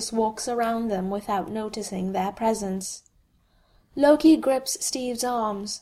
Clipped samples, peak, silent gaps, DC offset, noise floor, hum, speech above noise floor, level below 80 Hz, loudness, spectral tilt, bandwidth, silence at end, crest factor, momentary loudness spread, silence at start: under 0.1%; -8 dBFS; none; under 0.1%; -63 dBFS; none; 39 dB; -56 dBFS; -25 LUFS; -4.5 dB/octave; 15 kHz; 0.05 s; 18 dB; 13 LU; 0 s